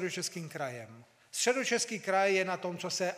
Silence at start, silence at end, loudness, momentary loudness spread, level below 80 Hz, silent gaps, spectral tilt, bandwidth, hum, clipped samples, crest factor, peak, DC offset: 0 s; 0 s; -32 LUFS; 12 LU; -88 dBFS; none; -2.5 dB/octave; 15.5 kHz; none; under 0.1%; 20 dB; -12 dBFS; under 0.1%